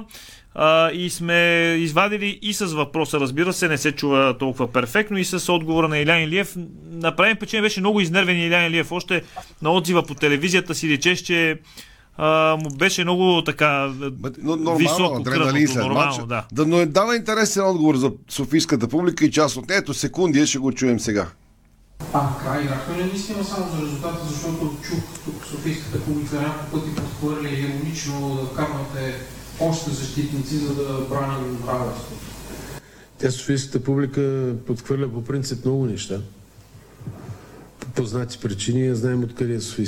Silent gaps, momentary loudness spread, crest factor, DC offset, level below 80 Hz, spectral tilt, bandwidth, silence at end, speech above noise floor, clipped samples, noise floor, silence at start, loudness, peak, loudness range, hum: none; 12 LU; 18 dB; under 0.1%; -48 dBFS; -4.5 dB/octave; 17.5 kHz; 0 s; 32 dB; under 0.1%; -53 dBFS; 0 s; -21 LUFS; -4 dBFS; 8 LU; none